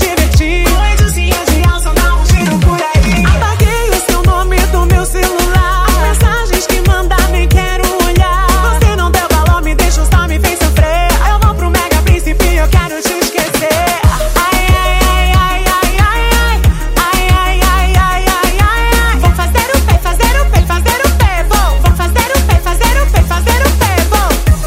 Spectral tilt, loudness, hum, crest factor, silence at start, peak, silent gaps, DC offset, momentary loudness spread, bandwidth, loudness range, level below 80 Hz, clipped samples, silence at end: -4.5 dB/octave; -11 LUFS; none; 10 dB; 0 s; 0 dBFS; none; under 0.1%; 2 LU; 16.5 kHz; 1 LU; -12 dBFS; under 0.1%; 0 s